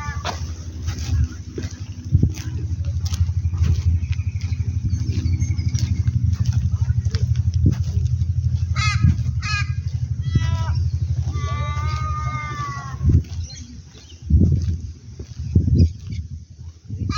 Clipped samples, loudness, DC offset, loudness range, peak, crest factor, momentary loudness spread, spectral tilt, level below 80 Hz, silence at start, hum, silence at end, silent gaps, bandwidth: under 0.1%; -22 LUFS; under 0.1%; 3 LU; -4 dBFS; 18 dB; 13 LU; -6.5 dB/octave; -28 dBFS; 0 s; none; 0 s; none; 7.2 kHz